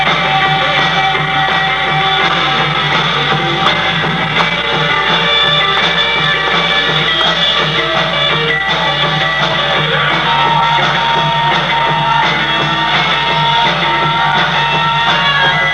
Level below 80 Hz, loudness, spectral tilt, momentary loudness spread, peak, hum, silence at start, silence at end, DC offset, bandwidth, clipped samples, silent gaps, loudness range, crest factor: -38 dBFS; -11 LUFS; -4 dB/octave; 2 LU; 0 dBFS; none; 0 s; 0 s; 0.4%; 11 kHz; under 0.1%; none; 1 LU; 12 dB